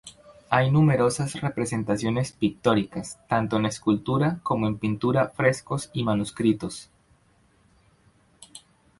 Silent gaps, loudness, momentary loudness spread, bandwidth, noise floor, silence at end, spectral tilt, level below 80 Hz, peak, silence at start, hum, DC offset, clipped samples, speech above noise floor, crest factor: none; -25 LUFS; 10 LU; 11.5 kHz; -62 dBFS; 0.4 s; -6 dB/octave; -54 dBFS; -4 dBFS; 0.05 s; none; under 0.1%; under 0.1%; 38 dB; 22 dB